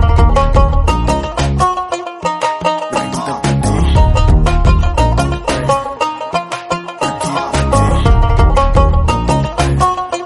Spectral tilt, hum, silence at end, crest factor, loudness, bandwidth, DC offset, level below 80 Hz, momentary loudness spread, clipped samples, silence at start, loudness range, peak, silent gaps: -6 dB/octave; none; 0 s; 12 dB; -14 LUFS; 11.5 kHz; under 0.1%; -16 dBFS; 8 LU; under 0.1%; 0 s; 2 LU; 0 dBFS; none